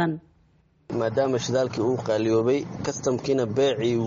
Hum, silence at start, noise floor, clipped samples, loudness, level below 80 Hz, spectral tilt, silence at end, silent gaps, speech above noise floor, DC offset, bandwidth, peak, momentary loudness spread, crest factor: none; 0 s; -61 dBFS; under 0.1%; -25 LUFS; -58 dBFS; -5.5 dB/octave; 0 s; none; 37 dB; under 0.1%; 7.6 kHz; -10 dBFS; 6 LU; 14 dB